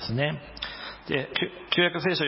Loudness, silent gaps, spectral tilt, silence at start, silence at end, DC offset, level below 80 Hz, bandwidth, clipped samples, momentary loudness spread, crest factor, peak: -27 LUFS; none; -9 dB/octave; 0 s; 0 s; under 0.1%; -54 dBFS; 5.8 kHz; under 0.1%; 12 LU; 20 dB; -8 dBFS